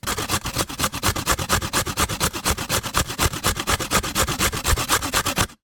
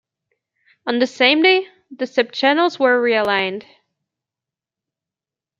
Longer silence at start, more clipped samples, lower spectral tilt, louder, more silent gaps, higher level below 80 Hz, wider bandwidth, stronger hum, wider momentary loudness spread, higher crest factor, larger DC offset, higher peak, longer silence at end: second, 0.05 s vs 0.85 s; neither; second, -2.5 dB/octave vs -4 dB/octave; second, -22 LUFS vs -17 LUFS; neither; first, -34 dBFS vs -70 dBFS; first, 18 kHz vs 7.6 kHz; neither; second, 3 LU vs 15 LU; about the same, 20 dB vs 18 dB; neither; about the same, -2 dBFS vs -2 dBFS; second, 0.1 s vs 2 s